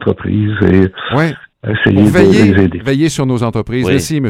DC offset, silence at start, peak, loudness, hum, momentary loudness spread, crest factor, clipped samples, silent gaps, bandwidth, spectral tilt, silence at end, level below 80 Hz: under 0.1%; 0 s; 0 dBFS; -12 LUFS; none; 8 LU; 12 dB; 1%; none; 15.5 kHz; -6.5 dB/octave; 0 s; -38 dBFS